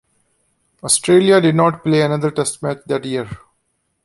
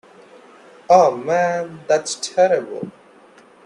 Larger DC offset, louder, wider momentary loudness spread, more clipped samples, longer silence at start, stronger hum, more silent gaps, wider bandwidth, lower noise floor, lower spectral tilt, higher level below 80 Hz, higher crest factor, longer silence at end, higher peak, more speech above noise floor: neither; about the same, -16 LUFS vs -18 LUFS; about the same, 14 LU vs 16 LU; neither; about the same, 0.85 s vs 0.9 s; neither; neither; about the same, 11.5 kHz vs 11 kHz; first, -68 dBFS vs -48 dBFS; about the same, -4.5 dB/octave vs -3.5 dB/octave; first, -54 dBFS vs -68 dBFS; about the same, 16 dB vs 20 dB; about the same, 0.7 s vs 0.75 s; about the same, -2 dBFS vs 0 dBFS; first, 53 dB vs 31 dB